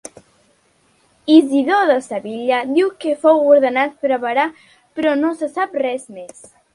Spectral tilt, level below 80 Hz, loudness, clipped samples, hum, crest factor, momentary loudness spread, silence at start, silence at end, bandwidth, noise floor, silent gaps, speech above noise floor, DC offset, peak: -4 dB/octave; -66 dBFS; -16 LUFS; under 0.1%; none; 18 dB; 15 LU; 1.25 s; 0.5 s; 11.5 kHz; -58 dBFS; none; 42 dB; under 0.1%; 0 dBFS